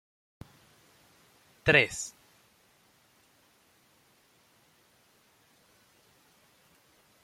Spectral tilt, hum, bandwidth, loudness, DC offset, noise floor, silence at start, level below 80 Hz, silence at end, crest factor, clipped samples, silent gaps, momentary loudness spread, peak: -3.5 dB/octave; none; 16.5 kHz; -26 LUFS; under 0.1%; -65 dBFS; 1.65 s; -64 dBFS; 5.15 s; 30 dB; under 0.1%; none; 31 LU; -6 dBFS